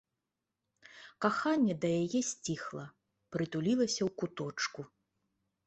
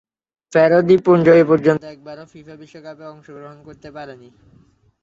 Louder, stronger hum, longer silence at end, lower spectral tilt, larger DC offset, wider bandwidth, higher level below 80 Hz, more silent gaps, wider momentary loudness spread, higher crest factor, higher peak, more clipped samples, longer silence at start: second, -34 LUFS vs -14 LUFS; neither; about the same, 0.8 s vs 0.9 s; second, -4.5 dB/octave vs -8 dB/octave; neither; first, 8.4 kHz vs 7.4 kHz; second, -74 dBFS vs -58 dBFS; neither; second, 18 LU vs 26 LU; about the same, 20 dB vs 16 dB; second, -14 dBFS vs -2 dBFS; neither; first, 0.95 s vs 0.5 s